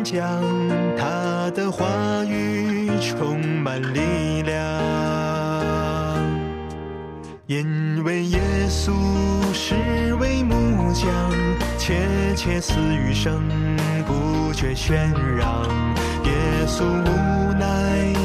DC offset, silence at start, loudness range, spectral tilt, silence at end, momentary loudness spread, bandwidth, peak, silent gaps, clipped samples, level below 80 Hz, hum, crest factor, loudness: under 0.1%; 0 s; 3 LU; -6 dB/octave; 0 s; 3 LU; 14 kHz; -8 dBFS; none; under 0.1%; -30 dBFS; none; 12 dB; -22 LUFS